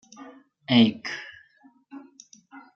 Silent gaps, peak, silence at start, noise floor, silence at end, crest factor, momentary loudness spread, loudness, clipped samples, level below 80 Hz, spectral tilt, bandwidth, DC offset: none; -4 dBFS; 0.2 s; -58 dBFS; 0.15 s; 24 dB; 27 LU; -23 LUFS; under 0.1%; -74 dBFS; -5.5 dB/octave; 7.2 kHz; under 0.1%